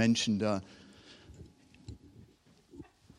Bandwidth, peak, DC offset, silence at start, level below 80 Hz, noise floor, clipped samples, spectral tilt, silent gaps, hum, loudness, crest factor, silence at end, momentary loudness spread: 11 kHz; -14 dBFS; under 0.1%; 0 s; -64 dBFS; -63 dBFS; under 0.1%; -4.5 dB/octave; none; none; -31 LUFS; 22 dB; 0.35 s; 26 LU